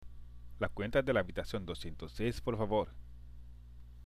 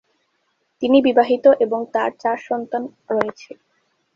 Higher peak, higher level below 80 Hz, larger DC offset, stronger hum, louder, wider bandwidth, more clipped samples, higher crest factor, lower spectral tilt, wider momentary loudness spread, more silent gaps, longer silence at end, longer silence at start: second, -18 dBFS vs 0 dBFS; first, -50 dBFS vs -64 dBFS; neither; first, 60 Hz at -50 dBFS vs none; second, -36 LUFS vs -19 LUFS; first, 15 kHz vs 7 kHz; neither; about the same, 20 dB vs 20 dB; about the same, -6.5 dB/octave vs -6 dB/octave; first, 23 LU vs 12 LU; neither; second, 0 s vs 0.7 s; second, 0 s vs 0.8 s